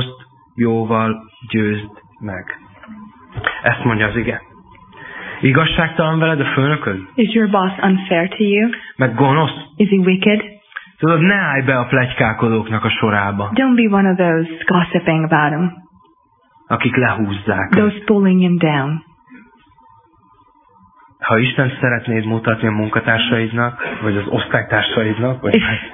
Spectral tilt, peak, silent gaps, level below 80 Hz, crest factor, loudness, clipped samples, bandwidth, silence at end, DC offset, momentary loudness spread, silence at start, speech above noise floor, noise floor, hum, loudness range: -10.5 dB/octave; 0 dBFS; none; -46 dBFS; 16 dB; -16 LUFS; under 0.1%; 3.9 kHz; 0 s; under 0.1%; 12 LU; 0 s; 39 dB; -55 dBFS; none; 6 LU